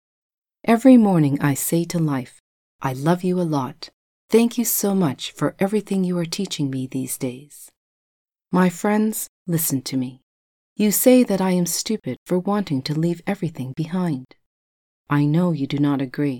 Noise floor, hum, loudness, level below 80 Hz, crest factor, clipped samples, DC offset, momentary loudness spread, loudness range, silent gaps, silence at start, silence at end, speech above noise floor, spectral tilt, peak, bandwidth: under -90 dBFS; none; -21 LUFS; -62 dBFS; 20 dB; under 0.1%; under 0.1%; 12 LU; 5 LU; 2.40-2.79 s, 3.93-4.28 s, 7.77-8.26 s, 9.29-9.45 s, 10.23-10.76 s, 12.17-12.26 s, 14.46-15.05 s; 0.65 s; 0 s; over 70 dB; -5.5 dB/octave; -2 dBFS; 19 kHz